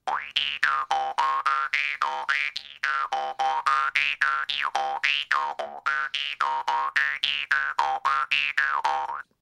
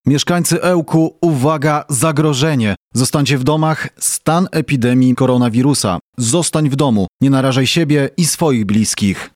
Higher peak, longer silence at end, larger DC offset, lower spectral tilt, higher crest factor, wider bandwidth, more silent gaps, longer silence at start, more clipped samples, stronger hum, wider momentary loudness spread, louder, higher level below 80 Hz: second, -6 dBFS vs 0 dBFS; about the same, 0.2 s vs 0.1 s; neither; second, 1 dB/octave vs -5 dB/octave; first, 20 dB vs 14 dB; second, 14 kHz vs 16.5 kHz; second, none vs 2.77-2.91 s, 6.01-6.13 s, 7.08-7.20 s; about the same, 0.05 s vs 0.05 s; neither; neither; about the same, 5 LU vs 4 LU; second, -25 LUFS vs -14 LUFS; second, -68 dBFS vs -48 dBFS